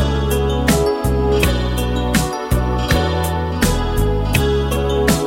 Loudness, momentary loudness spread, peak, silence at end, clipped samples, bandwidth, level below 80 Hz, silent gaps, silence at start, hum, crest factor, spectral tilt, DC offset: -17 LUFS; 4 LU; -2 dBFS; 0 s; under 0.1%; 16.5 kHz; -22 dBFS; none; 0 s; none; 14 dB; -5.5 dB/octave; under 0.1%